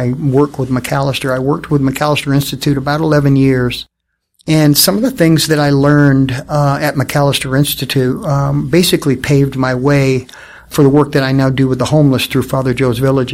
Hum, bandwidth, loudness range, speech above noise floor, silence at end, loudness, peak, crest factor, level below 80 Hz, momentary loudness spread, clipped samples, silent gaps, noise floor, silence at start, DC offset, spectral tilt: none; 16.5 kHz; 2 LU; 47 dB; 0 s; -12 LUFS; 0 dBFS; 12 dB; -38 dBFS; 6 LU; under 0.1%; none; -59 dBFS; 0 s; under 0.1%; -5.5 dB/octave